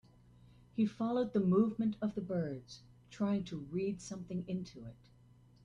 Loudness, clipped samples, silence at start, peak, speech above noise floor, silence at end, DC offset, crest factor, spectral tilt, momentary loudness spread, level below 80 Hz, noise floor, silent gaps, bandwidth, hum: -36 LUFS; under 0.1%; 0.75 s; -18 dBFS; 27 dB; 0.7 s; under 0.1%; 18 dB; -7.5 dB/octave; 20 LU; -68 dBFS; -63 dBFS; none; 10 kHz; none